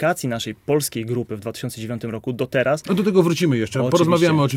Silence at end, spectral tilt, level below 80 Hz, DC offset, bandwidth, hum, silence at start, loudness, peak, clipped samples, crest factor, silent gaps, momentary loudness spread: 0 s; -5.5 dB/octave; -56 dBFS; under 0.1%; 17 kHz; none; 0 s; -21 LUFS; -4 dBFS; under 0.1%; 16 dB; none; 12 LU